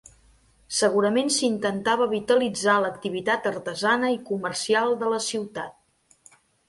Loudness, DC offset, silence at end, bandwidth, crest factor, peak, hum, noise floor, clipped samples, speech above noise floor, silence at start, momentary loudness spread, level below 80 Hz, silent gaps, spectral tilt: -24 LUFS; under 0.1%; 0.95 s; 11.5 kHz; 18 dB; -8 dBFS; none; -63 dBFS; under 0.1%; 39 dB; 0.7 s; 7 LU; -64 dBFS; none; -3 dB/octave